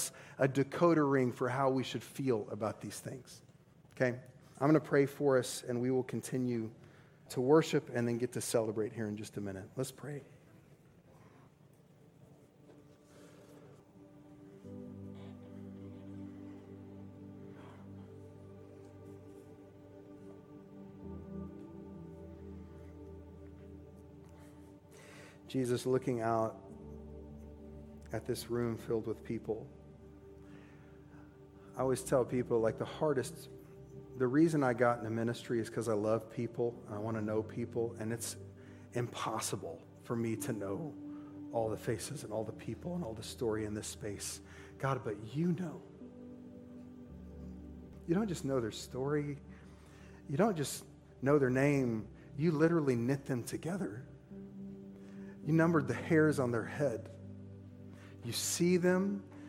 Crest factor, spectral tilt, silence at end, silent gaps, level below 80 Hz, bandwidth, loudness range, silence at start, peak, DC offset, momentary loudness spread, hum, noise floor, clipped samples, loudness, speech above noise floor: 22 dB; -6 dB/octave; 0 s; none; -64 dBFS; 16.5 kHz; 18 LU; 0 s; -14 dBFS; under 0.1%; 24 LU; none; -63 dBFS; under 0.1%; -35 LUFS; 28 dB